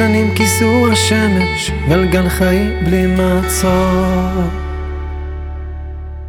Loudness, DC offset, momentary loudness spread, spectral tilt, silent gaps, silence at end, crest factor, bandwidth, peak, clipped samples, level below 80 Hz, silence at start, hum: -14 LUFS; under 0.1%; 14 LU; -5 dB/octave; none; 0 s; 14 dB; 18 kHz; 0 dBFS; under 0.1%; -24 dBFS; 0 s; none